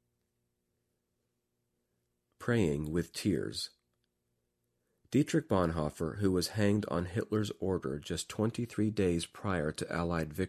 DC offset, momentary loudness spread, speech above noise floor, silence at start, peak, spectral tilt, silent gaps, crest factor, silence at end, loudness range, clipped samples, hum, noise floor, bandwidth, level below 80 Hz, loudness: under 0.1%; 6 LU; 50 dB; 2.4 s; -14 dBFS; -6 dB/octave; none; 20 dB; 0 s; 4 LU; under 0.1%; 60 Hz at -60 dBFS; -82 dBFS; 14.5 kHz; -52 dBFS; -33 LUFS